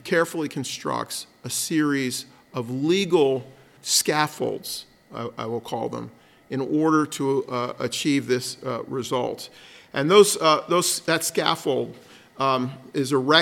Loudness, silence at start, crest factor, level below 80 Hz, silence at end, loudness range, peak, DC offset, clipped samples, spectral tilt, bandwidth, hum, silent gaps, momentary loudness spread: -23 LUFS; 0.05 s; 22 dB; -70 dBFS; 0 s; 5 LU; -2 dBFS; under 0.1%; under 0.1%; -3.5 dB/octave; 17.5 kHz; none; none; 14 LU